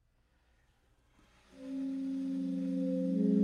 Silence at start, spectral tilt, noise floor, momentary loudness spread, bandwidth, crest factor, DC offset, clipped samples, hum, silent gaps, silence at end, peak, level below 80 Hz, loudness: 1.55 s; -9.5 dB/octave; -71 dBFS; 10 LU; 9.4 kHz; 18 dB; under 0.1%; under 0.1%; none; none; 0 s; -18 dBFS; -72 dBFS; -35 LUFS